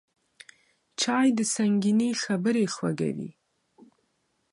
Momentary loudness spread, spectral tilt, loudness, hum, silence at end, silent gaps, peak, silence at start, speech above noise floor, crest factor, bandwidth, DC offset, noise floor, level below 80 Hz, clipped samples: 10 LU; -4.5 dB/octave; -26 LUFS; none; 1.25 s; none; -12 dBFS; 1 s; 48 dB; 16 dB; 11.5 kHz; under 0.1%; -74 dBFS; -74 dBFS; under 0.1%